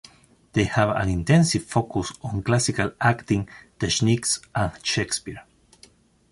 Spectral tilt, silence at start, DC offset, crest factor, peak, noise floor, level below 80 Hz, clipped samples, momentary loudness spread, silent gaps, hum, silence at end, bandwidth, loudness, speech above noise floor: -4.5 dB/octave; 0.55 s; under 0.1%; 18 dB; -6 dBFS; -55 dBFS; -44 dBFS; under 0.1%; 10 LU; none; none; 0.9 s; 11.5 kHz; -23 LUFS; 32 dB